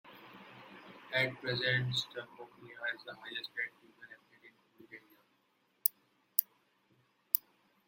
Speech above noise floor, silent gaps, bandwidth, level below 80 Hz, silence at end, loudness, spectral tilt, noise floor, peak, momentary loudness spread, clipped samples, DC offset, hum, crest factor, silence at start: 37 dB; none; 16.5 kHz; -78 dBFS; 0.5 s; -35 LUFS; -3 dB/octave; -75 dBFS; -2 dBFS; 22 LU; under 0.1%; under 0.1%; none; 38 dB; 0.05 s